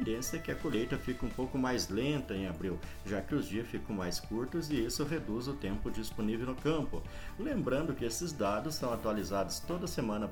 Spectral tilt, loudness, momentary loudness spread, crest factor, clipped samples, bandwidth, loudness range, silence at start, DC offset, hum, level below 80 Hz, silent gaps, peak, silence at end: -5 dB/octave; -36 LUFS; 6 LU; 16 dB; under 0.1%; 19.5 kHz; 1 LU; 0 s; under 0.1%; none; -48 dBFS; none; -20 dBFS; 0 s